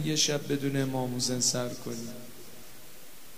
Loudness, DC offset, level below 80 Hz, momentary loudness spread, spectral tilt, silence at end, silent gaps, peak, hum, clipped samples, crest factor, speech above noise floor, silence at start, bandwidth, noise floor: -29 LUFS; 0.8%; -66 dBFS; 22 LU; -3.5 dB/octave; 0 s; none; -12 dBFS; none; under 0.1%; 18 dB; 21 dB; 0 s; 16 kHz; -51 dBFS